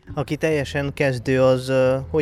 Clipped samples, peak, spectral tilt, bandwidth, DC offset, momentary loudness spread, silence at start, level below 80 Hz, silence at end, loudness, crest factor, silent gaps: under 0.1%; -6 dBFS; -6.5 dB/octave; 14 kHz; under 0.1%; 6 LU; 0.05 s; -44 dBFS; 0 s; -21 LUFS; 14 dB; none